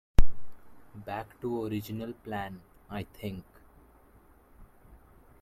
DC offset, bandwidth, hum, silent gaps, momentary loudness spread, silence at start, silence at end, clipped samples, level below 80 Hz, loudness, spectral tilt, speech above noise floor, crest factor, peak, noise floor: under 0.1%; 14 kHz; none; none; 25 LU; 0.2 s; 2 s; under 0.1%; -36 dBFS; -37 LUFS; -7 dB/octave; 22 dB; 22 dB; -4 dBFS; -59 dBFS